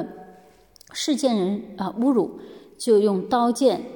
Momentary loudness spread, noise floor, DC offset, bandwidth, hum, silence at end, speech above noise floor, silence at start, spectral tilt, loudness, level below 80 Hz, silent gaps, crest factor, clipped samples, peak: 12 LU; -52 dBFS; under 0.1%; 17.5 kHz; none; 0 s; 31 dB; 0 s; -5 dB/octave; -22 LUFS; -66 dBFS; none; 16 dB; under 0.1%; -8 dBFS